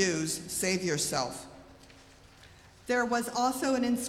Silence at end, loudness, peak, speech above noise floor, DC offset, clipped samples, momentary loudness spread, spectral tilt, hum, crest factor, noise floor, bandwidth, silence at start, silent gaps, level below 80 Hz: 0 s; -30 LUFS; -12 dBFS; 25 dB; under 0.1%; under 0.1%; 12 LU; -3 dB/octave; none; 20 dB; -55 dBFS; 16.5 kHz; 0 s; none; -62 dBFS